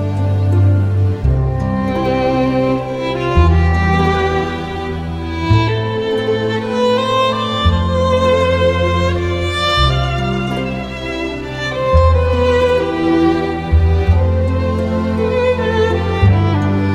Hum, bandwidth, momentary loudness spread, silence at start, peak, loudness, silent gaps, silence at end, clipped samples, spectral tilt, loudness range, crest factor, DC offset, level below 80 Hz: none; 8.8 kHz; 8 LU; 0 s; 0 dBFS; -15 LUFS; none; 0 s; under 0.1%; -7 dB/octave; 2 LU; 14 dB; under 0.1%; -24 dBFS